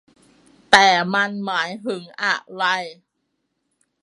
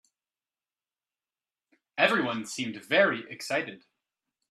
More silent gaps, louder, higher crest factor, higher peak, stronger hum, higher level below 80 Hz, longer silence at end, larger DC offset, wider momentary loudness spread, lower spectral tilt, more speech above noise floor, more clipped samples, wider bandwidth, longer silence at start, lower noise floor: neither; first, -19 LUFS vs -27 LUFS; about the same, 22 dB vs 24 dB; first, 0 dBFS vs -8 dBFS; neither; first, -64 dBFS vs -78 dBFS; first, 1.1 s vs 0.7 s; neither; first, 15 LU vs 11 LU; about the same, -2.5 dB/octave vs -3.5 dB/octave; second, 54 dB vs over 62 dB; neither; second, 11.5 kHz vs 13.5 kHz; second, 0.7 s vs 1.95 s; second, -74 dBFS vs under -90 dBFS